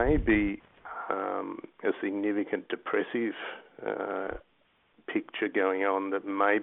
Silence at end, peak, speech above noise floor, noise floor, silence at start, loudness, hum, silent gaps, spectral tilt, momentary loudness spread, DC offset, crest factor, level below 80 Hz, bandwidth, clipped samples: 0 s; -10 dBFS; 38 dB; -68 dBFS; 0 s; -31 LUFS; none; none; -10 dB/octave; 14 LU; under 0.1%; 20 dB; -46 dBFS; 3.9 kHz; under 0.1%